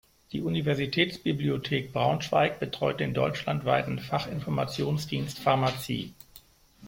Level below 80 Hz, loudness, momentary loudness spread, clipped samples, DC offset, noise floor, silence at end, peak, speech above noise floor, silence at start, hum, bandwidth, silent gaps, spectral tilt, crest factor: -58 dBFS; -28 LUFS; 7 LU; under 0.1%; under 0.1%; -55 dBFS; 0 s; -8 dBFS; 27 dB; 0.3 s; none; 16.5 kHz; none; -6 dB/octave; 20 dB